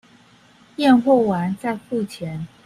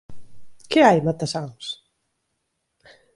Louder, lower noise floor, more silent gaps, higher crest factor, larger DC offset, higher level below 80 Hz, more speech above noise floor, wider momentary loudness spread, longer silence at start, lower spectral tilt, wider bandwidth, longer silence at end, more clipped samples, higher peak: about the same, -20 LUFS vs -20 LUFS; second, -52 dBFS vs -75 dBFS; neither; about the same, 18 dB vs 22 dB; neither; about the same, -58 dBFS vs -60 dBFS; second, 33 dB vs 56 dB; second, 15 LU vs 18 LU; first, 0.8 s vs 0.1 s; first, -7 dB/octave vs -5.5 dB/octave; first, 13.5 kHz vs 11.5 kHz; second, 0.2 s vs 1.4 s; neither; about the same, -4 dBFS vs -2 dBFS